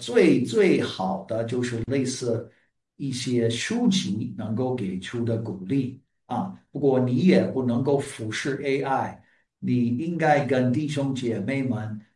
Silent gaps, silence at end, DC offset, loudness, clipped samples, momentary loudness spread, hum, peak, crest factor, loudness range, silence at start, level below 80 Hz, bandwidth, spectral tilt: none; 0.15 s; under 0.1%; -25 LUFS; under 0.1%; 11 LU; none; -6 dBFS; 18 dB; 3 LU; 0 s; -62 dBFS; 11.5 kHz; -6 dB/octave